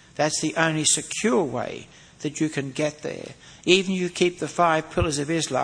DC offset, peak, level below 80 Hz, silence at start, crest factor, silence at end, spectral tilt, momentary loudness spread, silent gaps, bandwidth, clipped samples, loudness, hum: under 0.1%; -2 dBFS; -48 dBFS; 0.15 s; 22 dB; 0 s; -3.5 dB/octave; 14 LU; none; 10.5 kHz; under 0.1%; -23 LUFS; none